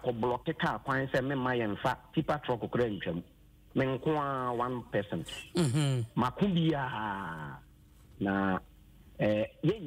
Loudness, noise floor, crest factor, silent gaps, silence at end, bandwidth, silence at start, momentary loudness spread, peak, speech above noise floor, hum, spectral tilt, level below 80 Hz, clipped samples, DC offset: -32 LUFS; -57 dBFS; 16 dB; none; 0 s; 16 kHz; 0 s; 8 LU; -18 dBFS; 26 dB; none; -6.5 dB/octave; -58 dBFS; under 0.1%; under 0.1%